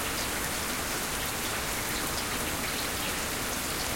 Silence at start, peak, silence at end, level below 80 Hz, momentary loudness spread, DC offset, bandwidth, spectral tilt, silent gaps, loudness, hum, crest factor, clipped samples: 0 s; -14 dBFS; 0 s; -46 dBFS; 1 LU; under 0.1%; 16.5 kHz; -2 dB/octave; none; -30 LUFS; none; 16 dB; under 0.1%